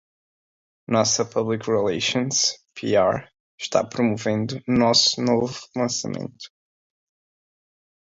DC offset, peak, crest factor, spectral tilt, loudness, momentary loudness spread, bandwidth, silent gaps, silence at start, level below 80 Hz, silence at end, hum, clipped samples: under 0.1%; -4 dBFS; 20 dB; -3.5 dB/octave; -22 LUFS; 14 LU; 7.8 kHz; 3.40-3.58 s; 0.9 s; -58 dBFS; 1.65 s; none; under 0.1%